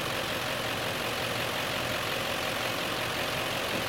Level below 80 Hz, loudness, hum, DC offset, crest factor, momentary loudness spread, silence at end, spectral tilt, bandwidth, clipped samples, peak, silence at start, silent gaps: -56 dBFS; -30 LUFS; none; under 0.1%; 14 dB; 1 LU; 0 s; -3 dB/octave; 17 kHz; under 0.1%; -18 dBFS; 0 s; none